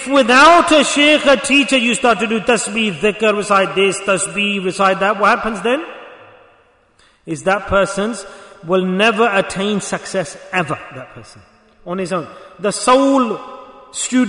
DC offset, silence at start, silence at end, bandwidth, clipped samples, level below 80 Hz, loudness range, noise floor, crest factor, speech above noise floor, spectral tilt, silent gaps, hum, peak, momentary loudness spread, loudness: under 0.1%; 0 s; 0 s; 11 kHz; under 0.1%; -46 dBFS; 8 LU; -53 dBFS; 16 dB; 38 dB; -3.5 dB/octave; none; none; 0 dBFS; 16 LU; -14 LUFS